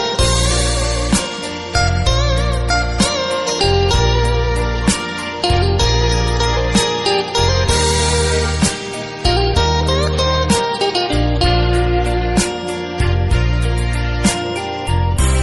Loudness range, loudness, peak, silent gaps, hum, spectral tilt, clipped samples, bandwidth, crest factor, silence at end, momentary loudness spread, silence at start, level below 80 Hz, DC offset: 2 LU; -16 LUFS; -2 dBFS; none; none; -4.5 dB/octave; under 0.1%; 12 kHz; 14 dB; 0 s; 5 LU; 0 s; -20 dBFS; under 0.1%